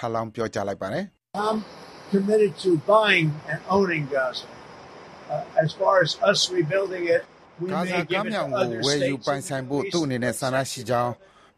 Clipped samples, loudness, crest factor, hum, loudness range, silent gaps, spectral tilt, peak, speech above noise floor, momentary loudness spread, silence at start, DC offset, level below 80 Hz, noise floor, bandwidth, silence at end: under 0.1%; -24 LUFS; 22 dB; none; 3 LU; none; -4.5 dB/octave; -4 dBFS; 20 dB; 14 LU; 0 s; under 0.1%; -62 dBFS; -44 dBFS; 14 kHz; 0.45 s